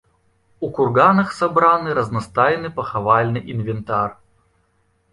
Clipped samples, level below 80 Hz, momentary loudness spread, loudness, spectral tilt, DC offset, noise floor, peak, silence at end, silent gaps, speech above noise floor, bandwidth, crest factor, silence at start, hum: under 0.1%; -52 dBFS; 11 LU; -18 LUFS; -7.5 dB/octave; under 0.1%; -63 dBFS; -2 dBFS; 1 s; none; 45 dB; 11.5 kHz; 18 dB; 0.6 s; none